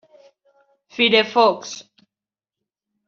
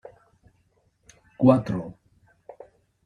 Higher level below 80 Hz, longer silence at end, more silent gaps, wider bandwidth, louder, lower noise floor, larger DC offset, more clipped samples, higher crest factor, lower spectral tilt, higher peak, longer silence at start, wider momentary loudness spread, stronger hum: second, -72 dBFS vs -58 dBFS; about the same, 1.25 s vs 1.15 s; neither; second, 7.4 kHz vs 9.6 kHz; first, -17 LUFS vs -22 LUFS; first, under -90 dBFS vs -67 dBFS; neither; neither; about the same, 20 dB vs 24 dB; second, -3 dB/octave vs -9.5 dB/octave; about the same, -2 dBFS vs -4 dBFS; second, 1 s vs 1.4 s; second, 21 LU vs 28 LU; neither